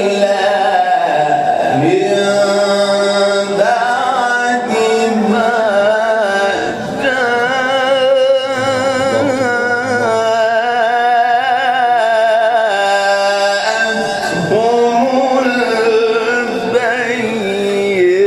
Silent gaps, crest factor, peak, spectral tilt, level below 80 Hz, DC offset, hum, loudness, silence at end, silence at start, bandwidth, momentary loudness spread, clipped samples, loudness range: none; 12 dB; 0 dBFS; -4 dB/octave; -54 dBFS; under 0.1%; none; -13 LUFS; 0 s; 0 s; 13.5 kHz; 3 LU; under 0.1%; 1 LU